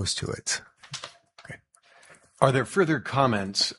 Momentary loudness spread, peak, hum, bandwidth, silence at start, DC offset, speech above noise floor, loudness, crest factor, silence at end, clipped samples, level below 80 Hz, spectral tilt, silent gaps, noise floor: 21 LU; -2 dBFS; none; 11.5 kHz; 0 s; under 0.1%; 33 dB; -25 LUFS; 26 dB; 0.05 s; under 0.1%; -58 dBFS; -4 dB/octave; none; -58 dBFS